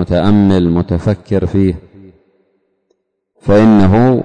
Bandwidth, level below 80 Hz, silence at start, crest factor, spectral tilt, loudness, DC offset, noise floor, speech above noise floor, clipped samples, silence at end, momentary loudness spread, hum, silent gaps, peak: 9 kHz; -34 dBFS; 0 s; 10 dB; -9 dB/octave; -11 LUFS; under 0.1%; -64 dBFS; 54 dB; under 0.1%; 0 s; 8 LU; none; none; -2 dBFS